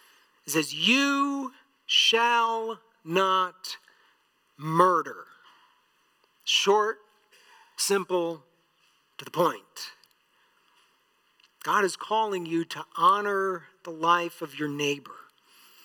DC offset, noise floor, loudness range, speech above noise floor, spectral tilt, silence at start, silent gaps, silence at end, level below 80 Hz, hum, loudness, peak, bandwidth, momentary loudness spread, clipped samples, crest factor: under 0.1%; -68 dBFS; 7 LU; 42 dB; -3 dB/octave; 0.45 s; none; 0.65 s; under -90 dBFS; none; -25 LUFS; -6 dBFS; 19 kHz; 19 LU; under 0.1%; 22 dB